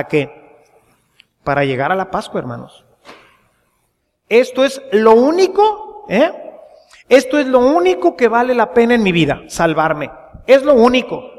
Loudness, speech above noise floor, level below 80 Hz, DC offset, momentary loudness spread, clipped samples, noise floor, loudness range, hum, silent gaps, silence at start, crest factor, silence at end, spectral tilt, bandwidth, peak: -14 LUFS; 53 dB; -48 dBFS; under 0.1%; 14 LU; under 0.1%; -66 dBFS; 9 LU; none; none; 0 s; 14 dB; 0.1 s; -5.5 dB/octave; 14 kHz; 0 dBFS